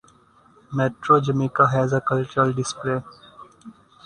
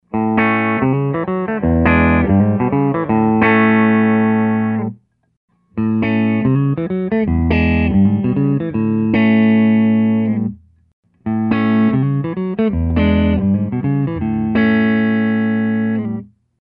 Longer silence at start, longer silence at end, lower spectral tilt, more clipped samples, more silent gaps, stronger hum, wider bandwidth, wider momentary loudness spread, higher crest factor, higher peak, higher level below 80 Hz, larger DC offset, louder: first, 0.7 s vs 0.15 s; about the same, 0.35 s vs 0.4 s; second, -6.5 dB/octave vs -11 dB/octave; neither; second, none vs 5.37-5.48 s, 10.93-11.03 s; neither; first, 10 kHz vs 5 kHz; about the same, 9 LU vs 7 LU; first, 20 dB vs 14 dB; second, -4 dBFS vs 0 dBFS; second, -58 dBFS vs -32 dBFS; neither; second, -21 LUFS vs -15 LUFS